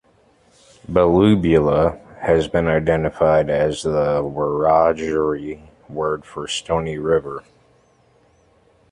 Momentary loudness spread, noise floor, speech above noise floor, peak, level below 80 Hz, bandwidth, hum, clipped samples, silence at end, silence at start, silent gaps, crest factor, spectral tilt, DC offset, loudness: 12 LU; -56 dBFS; 39 dB; -2 dBFS; -40 dBFS; 11 kHz; none; under 0.1%; 1.5 s; 0.9 s; none; 18 dB; -6.5 dB/octave; under 0.1%; -19 LUFS